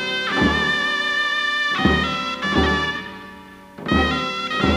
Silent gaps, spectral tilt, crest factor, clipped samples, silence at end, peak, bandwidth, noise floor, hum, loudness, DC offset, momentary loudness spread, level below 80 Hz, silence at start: none; -4.5 dB/octave; 18 dB; under 0.1%; 0 s; -4 dBFS; 15.5 kHz; -41 dBFS; none; -19 LUFS; under 0.1%; 11 LU; -34 dBFS; 0 s